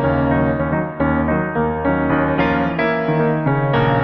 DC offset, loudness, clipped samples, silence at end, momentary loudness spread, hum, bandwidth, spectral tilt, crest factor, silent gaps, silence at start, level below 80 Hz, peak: under 0.1%; -18 LUFS; under 0.1%; 0 s; 3 LU; none; 5.8 kHz; -10 dB/octave; 12 dB; none; 0 s; -34 dBFS; -4 dBFS